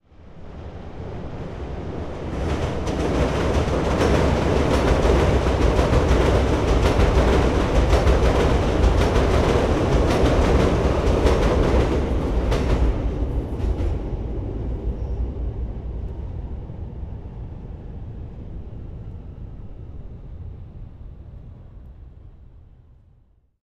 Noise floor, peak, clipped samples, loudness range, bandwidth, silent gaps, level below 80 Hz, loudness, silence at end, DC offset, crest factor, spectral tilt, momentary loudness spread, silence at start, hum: -57 dBFS; -4 dBFS; under 0.1%; 19 LU; 12 kHz; none; -24 dBFS; -21 LUFS; 1.05 s; under 0.1%; 16 dB; -7 dB/octave; 20 LU; 0.2 s; none